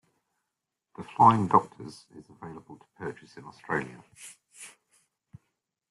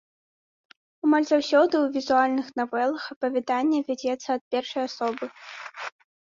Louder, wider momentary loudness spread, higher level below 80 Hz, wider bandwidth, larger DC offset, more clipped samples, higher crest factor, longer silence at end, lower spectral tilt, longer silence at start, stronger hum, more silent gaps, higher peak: about the same, -24 LUFS vs -25 LUFS; first, 27 LU vs 16 LU; about the same, -68 dBFS vs -72 dBFS; first, 12.5 kHz vs 7.6 kHz; neither; neither; first, 26 dB vs 18 dB; first, 1.25 s vs 0.4 s; first, -6.5 dB/octave vs -3.5 dB/octave; about the same, 1 s vs 1.05 s; neither; second, none vs 3.16-3.21 s, 4.41-4.51 s; first, -4 dBFS vs -8 dBFS